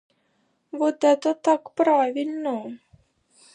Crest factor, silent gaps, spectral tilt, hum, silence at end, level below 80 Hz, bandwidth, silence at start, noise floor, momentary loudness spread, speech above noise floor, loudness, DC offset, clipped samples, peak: 18 dB; none; -4 dB/octave; none; 0.8 s; -74 dBFS; 10 kHz; 0.75 s; -69 dBFS; 12 LU; 47 dB; -23 LUFS; under 0.1%; under 0.1%; -6 dBFS